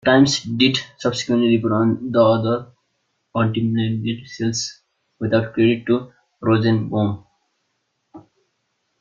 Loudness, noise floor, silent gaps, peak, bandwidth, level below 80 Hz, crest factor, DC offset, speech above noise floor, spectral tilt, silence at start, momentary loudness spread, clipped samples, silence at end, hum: -19 LUFS; -72 dBFS; none; -2 dBFS; 7.8 kHz; -56 dBFS; 18 dB; under 0.1%; 54 dB; -5.5 dB/octave; 0.05 s; 10 LU; under 0.1%; 0.8 s; none